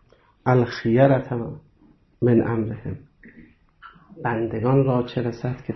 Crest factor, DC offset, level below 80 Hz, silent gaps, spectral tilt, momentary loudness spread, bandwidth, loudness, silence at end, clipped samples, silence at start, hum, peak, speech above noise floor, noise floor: 18 dB; under 0.1%; -52 dBFS; none; -9.5 dB/octave; 15 LU; 6.2 kHz; -22 LUFS; 0 s; under 0.1%; 0.45 s; none; -4 dBFS; 35 dB; -56 dBFS